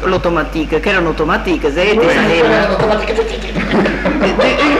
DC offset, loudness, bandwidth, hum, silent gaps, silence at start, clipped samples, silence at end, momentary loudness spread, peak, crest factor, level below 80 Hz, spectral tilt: under 0.1%; -13 LUFS; 13.5 kHz; none; none; 0 s; under 0.1%; 0 s; 6 LU; -2 dBFS; 12 dB; -26 dBFS; -5.5 dB/octave